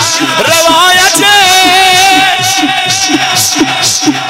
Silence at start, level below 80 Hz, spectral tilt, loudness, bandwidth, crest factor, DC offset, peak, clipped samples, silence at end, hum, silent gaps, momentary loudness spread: 0 s; -42 dBFS; -1 dB/octave; -5 LUFS; 16.5 kHz; 8 dB; under 0.1%; 0 dBFS; under 0.1%; 0 s; none; none; 5 LU